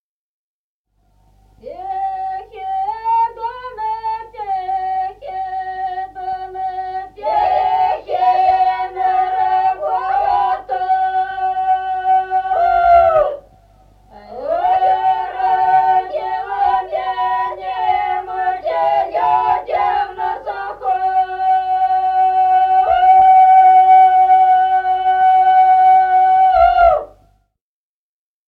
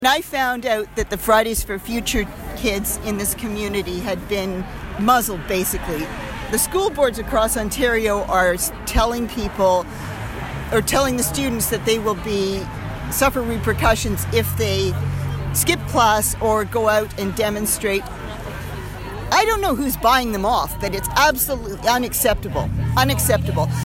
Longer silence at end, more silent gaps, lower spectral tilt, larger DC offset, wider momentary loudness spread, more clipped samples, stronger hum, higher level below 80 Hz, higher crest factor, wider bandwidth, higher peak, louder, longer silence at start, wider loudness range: first, 1.4 s vs 0 s; neither; about the same, -5 dB/octave vs -4 dB/octave; neither; first, 14 LU vs 10 LU; neither; neither; second, -46 dBFS vs -32 dBFS; about the same, 14 dB vs 16 dB; second, 4.9 kHz vs 16.5 kHz; about the same, -2 dBFS vs -4 dBFS; first, -15 LUFS vs -20 LUFS; first, 1.65 s vs 0 s; first, 12 LU vs 3 LU